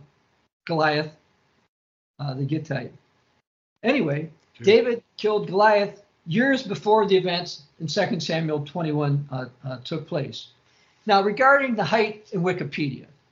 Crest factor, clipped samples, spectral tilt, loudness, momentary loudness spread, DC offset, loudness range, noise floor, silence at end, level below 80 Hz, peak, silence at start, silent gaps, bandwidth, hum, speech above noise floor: 20 dB; under 0.1%; -4 dB/octave; -23 LUFS; 16 LU; under 0.1%; 8 LU; -65 dBFS; 0.25 s; -70 dBFS; -4 dBFS; 0.65 s; 1.69-2.14 s, 3.47-3.76 s; 7.6 kHz; none; 42 dB